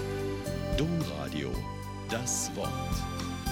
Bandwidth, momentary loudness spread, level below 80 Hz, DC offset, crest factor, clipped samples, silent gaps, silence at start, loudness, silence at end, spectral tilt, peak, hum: 17 kHz; 6 LU; -42 dBFS; under 0.1%; 14 dB; under 0.1%; none; 0 s; -33 LUFS; 0 s; -4.5 dB/octave; -18 dBFS; none